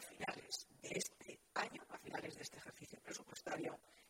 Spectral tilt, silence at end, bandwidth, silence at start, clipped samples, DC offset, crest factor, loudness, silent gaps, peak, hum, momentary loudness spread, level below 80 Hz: -2.5 dB/octave; 0 s; 16 kHz; 0 s; under 0.1%; under 0.1%; 22 dB; -48 LUFS; none; -28 dBFS; none; 10 LU; -82 dBFS